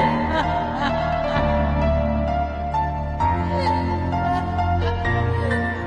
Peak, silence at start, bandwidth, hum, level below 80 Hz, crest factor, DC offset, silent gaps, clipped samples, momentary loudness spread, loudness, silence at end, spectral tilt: -8 dBFS; 0 s; 9.2 kHz; none; -30 dBFS; 14 dB; under 0.1%; none; under 0.1%; 3 LU; -22 LUFS; 0 s; -7.5 dB/octave